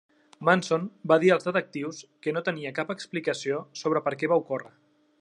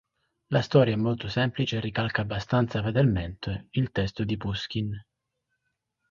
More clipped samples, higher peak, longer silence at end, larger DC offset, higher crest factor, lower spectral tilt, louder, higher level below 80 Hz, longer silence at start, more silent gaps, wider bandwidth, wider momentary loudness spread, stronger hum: neither; about the same, -6 dBFS vs -6 dBFS; second, 0.55 s vs 1.1 s; neither; about the same, 22 dB vs 22 dB; second, -5.5 dB/octave vs -7.5 dB/octave; about the same, -27 LUFS vs -27 LUFS; second, -78 dBFS vs -48 dBFS; about the same, 0.4 s vs 0.5 s; neither; first, 11 kHz vs 7.2 kHz; first, 12 LU vs 9 LU; neither